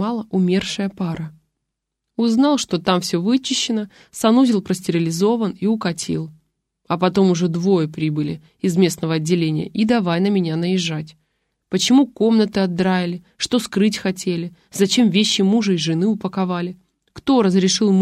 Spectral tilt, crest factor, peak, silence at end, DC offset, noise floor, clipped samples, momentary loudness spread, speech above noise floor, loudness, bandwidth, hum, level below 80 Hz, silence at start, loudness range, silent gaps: -5.5 dB/octave; 16 dB; -4 dBFS; 0 s; under 0.1%; -79 dBFS; under 0.1%; 10 LU; 61 dB; -19 LUFS; 14.5 kHz; none; -56 dBFS; 0 s; 2 LU; none